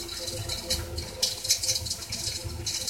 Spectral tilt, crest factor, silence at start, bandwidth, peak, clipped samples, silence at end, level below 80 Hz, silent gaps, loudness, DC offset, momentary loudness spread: -1.5 dB/octave; 24 dB; 0 s; 17 kHz; -8 dBFS; under 0.1%; 0 s; -46 dBFS; none; -28 LUFS; under 0.1%; 8 LU